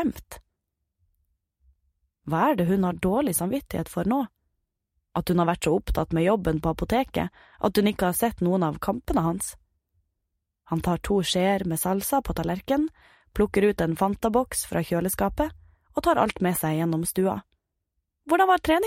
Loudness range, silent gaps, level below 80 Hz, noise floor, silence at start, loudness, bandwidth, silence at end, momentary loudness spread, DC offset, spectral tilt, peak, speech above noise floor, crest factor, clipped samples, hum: 2 LU; none; -44 dBFS; -81 dBFS; 0 s; -25 LUFS; 16 kHz; 0 s; 8 LU; under 0.1%; -5.5 dB/octave; -8 dBFS; 56 dB; 18 dB; under 0.1%; none